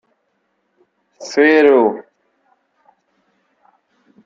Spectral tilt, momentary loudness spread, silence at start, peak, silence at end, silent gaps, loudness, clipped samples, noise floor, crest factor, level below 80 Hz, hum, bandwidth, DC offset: -4.5 dB/octave; 22 LU; 1.2 s; -2 dBFS; 2.25 s; none; -13 LUFS; under 0.1%; -67 dBFS; 18 dB; -68 dBFS; none; 7.6 kHz; under 0.1%